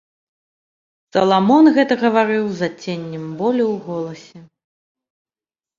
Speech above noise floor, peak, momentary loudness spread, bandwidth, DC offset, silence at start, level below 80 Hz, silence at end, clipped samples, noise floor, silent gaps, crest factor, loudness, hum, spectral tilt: over 73 dB; -2 dBFS; 15 LU; 7.4 kHz; under 0.1%; 1.15 s; -64 dBFS; 1.35 s; under 0.1%; under -90 dBFS; none; 18 dB; -17 LUFS; none; -6.5 dB/octave